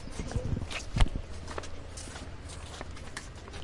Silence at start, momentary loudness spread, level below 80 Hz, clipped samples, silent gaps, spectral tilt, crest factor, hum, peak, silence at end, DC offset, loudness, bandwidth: 0 s; 12 LU; -36 dBFS; under 0.1%; none; -4.5 dB/octave; 26 dB; none; -8 dBFS; 0 s; under 0.1%; -38 LUFS; 11.5 kHz